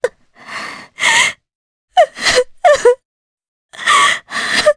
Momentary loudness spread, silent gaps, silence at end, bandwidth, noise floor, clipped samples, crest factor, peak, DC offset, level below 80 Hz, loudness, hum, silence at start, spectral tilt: 15 LU; 1.55-1.88 s, 3.05-3.38 s, 3.48-3.69 s; 0.05 s; 11 kHz; -33 dBFS; under 0.1%; 16 dB; 0 dBFS; under 0.1%; -50 dBFS; -13 LUFS; none; 0.05 s; 0 dB/octave